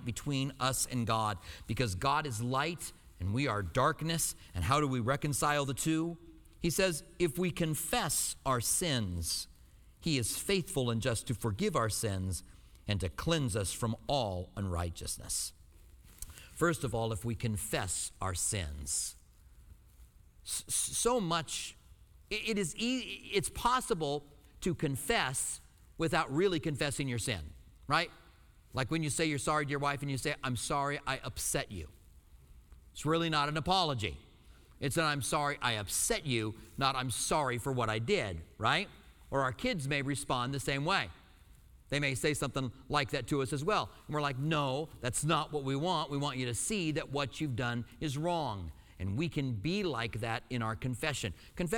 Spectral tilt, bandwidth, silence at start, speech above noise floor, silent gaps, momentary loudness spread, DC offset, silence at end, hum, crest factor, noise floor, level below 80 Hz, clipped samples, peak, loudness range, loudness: -4 dB/octave; 19.5 kHz; 0 s; 26 dB; none; 8 LU; under 0.1%; 0 s; none; 20 dB; -60 dBFS; -52 dBFS; under 0.1%; -14 dBFS; 3 LU; -34 LUFS